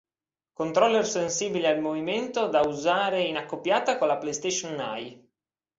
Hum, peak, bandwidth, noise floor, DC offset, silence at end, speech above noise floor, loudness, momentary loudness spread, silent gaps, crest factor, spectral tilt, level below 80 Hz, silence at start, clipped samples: none; -8 dBFS; 8 kHz; under -90 dBFS; under 0.1%; 0.65 s; over 64 dB; -26 LUFS; 10 LU; none; 18 dB; -3 dB/octave; -68 dBFS; 0.6 s; under 0.1%